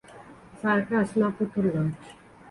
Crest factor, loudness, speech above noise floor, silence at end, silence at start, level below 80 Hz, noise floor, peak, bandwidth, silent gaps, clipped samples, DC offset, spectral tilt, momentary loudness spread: 16 dB; -26 LUFS; 23 dB; 0 s; 0.1 s; -60 dBFS; -48 dBFS; -12 dBFS; 11.5 kHz; none; under 0.1%; under 0.1%; -8 dB/octave; 7 LU